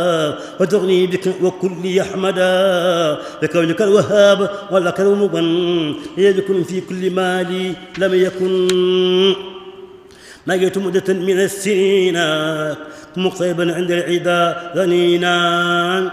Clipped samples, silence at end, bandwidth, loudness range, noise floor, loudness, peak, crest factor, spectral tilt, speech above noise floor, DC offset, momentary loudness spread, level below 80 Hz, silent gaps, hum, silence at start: under 0.1%; 0 s; 14.5 kHz; 3 LU; -41 dBFS; -16 LUFS; 0 dBFS; 16 dB; -5 dB/octave; 25 dB; under 0.1%; 8 LU; -58 dBFS; none; none; 0 s